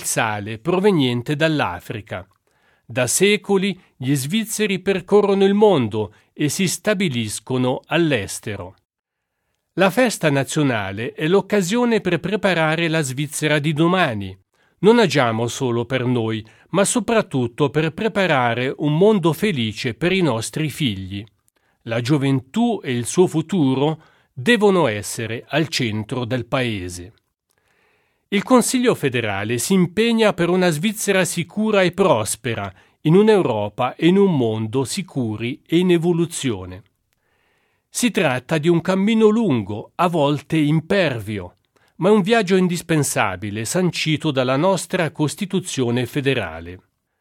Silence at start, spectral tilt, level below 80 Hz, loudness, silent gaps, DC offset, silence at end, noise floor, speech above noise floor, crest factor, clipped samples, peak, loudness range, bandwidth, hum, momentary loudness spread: 0 s; -5 dB/octave; -56 dBFS; -19 LUFS; 8.85-8.89 s, 8.99-9.03 s; under 0.1%; 0.45 s; -75 dBFS; 57 dB; 18 dB; under 0.1%; 0 dBFS; 4 LU; 16.5 kHz; none; 11 LU